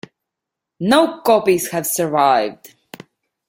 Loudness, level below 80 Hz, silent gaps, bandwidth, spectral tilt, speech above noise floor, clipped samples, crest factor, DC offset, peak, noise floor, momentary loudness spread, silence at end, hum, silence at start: -16 LUFS; -62 dBFS; none; 16.5 kHz; -4 dB/octave; 66 dB; under 0.1%; 18 dB; under 0.1%; 0 dBFS; -83 dBFS; 6 LU; 0.8 s; none; 0.8 s